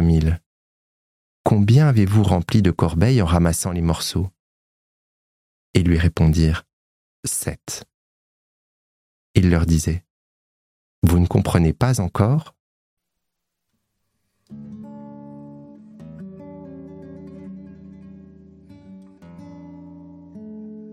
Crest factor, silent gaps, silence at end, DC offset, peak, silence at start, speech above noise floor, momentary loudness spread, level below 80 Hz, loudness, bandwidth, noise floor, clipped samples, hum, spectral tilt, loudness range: 20 dB; 0.46-1.44 s, 4.39-5.74 s, 6.73-7.23 s, 7.94-9.34 s, 10.10-11.02 s, 12.60-12.97 s; 0 s; under 0.1%; -2 dBFS; 0 s; 62 dB; 23 LU; -34 dBFS; -19 LUFS; 15.5 kHz; -79 dBFS; under 0.1%; none; -6.5 dB/octave; 23 LU